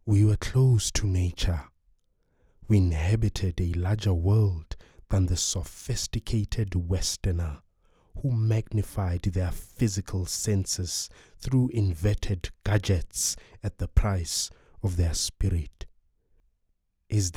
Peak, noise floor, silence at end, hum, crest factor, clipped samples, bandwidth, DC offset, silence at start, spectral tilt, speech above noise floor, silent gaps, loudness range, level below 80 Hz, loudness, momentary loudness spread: -8 dBFS; -73 dBFS; 0.05 s; none; 20 dB; under 0.1%; 15.5 kHz; under 0.1%; 0.05 s; -5 dB/octave; 47 dB; none; 3 LU; -36 dBFS; -27 LUFS; 10 LU